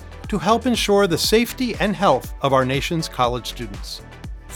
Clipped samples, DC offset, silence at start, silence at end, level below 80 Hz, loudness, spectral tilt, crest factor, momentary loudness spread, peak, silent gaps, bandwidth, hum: under 0.1%; under 0.1%; 0 s; 0 s; -36 dBFS; -19 LUFS; -4.5 dB/octave; 18 dB; 15 LU; -2 dBFS; none; over 20 kHz; none